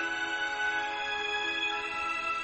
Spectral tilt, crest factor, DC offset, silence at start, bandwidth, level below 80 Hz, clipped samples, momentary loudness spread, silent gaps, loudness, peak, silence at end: -1 dB/octave; 14 dB; under 0.1%; 0 s; 8.4 kHz; -64 dBFS; under 0.1%; 2 LU; none; -31 LUFS; -20 dBFS; 0 s